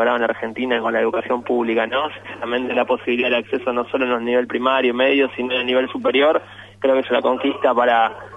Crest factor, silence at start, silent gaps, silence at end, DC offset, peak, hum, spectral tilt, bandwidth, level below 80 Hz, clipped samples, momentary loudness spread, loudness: 16 dB; 0 s; none; 0 s; under 0.1%; -4 dBFS; none; -5.5 dB/octave; 7.8 kHz; -62 dBFS; under 0.1%; 6 LU; -19 LUFS